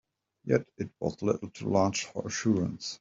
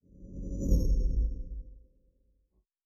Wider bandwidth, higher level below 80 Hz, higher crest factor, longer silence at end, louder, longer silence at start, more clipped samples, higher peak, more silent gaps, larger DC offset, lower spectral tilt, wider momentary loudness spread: second, 7.8 kHz vs 12.5 kHz; second, -64 dBFS vs -32 dBFS; about the same, 20 dB vs 18 dB; second, 0.05 s vs 1.05 s; first, -30 LUFS vs -33 LUFS; first, 0.45 s vs 0.2 s; neither; first, -10 dBFS vs -14 dBFS; neither; neither; second, -5 dB/octave vs -9 dB/octave; second, 8 LU vs 19 LU